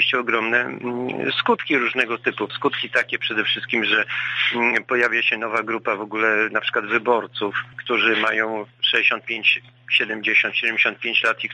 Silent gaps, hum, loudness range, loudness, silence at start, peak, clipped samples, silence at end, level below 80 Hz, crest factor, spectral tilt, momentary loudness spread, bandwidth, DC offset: none; none; 2 LU; -20 LUFS; 0 s; -4 dBFS; under 0.1%; 0 s; -70 dBFS; 18 dB; -4 dB/octave; 7 LU; 10 kHz; under 0.1%